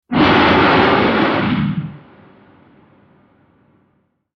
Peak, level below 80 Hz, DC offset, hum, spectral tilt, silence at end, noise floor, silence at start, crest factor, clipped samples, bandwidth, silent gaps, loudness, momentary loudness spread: 0 dBFS; -42 dBFS; under 0.1%; none; -7.5 dB/octave; 2.4 s; -62 dBFS; 0.1 s; 16 dB; under 0.1%; 6.4 kHz; none; -13 LUFS; 12 LU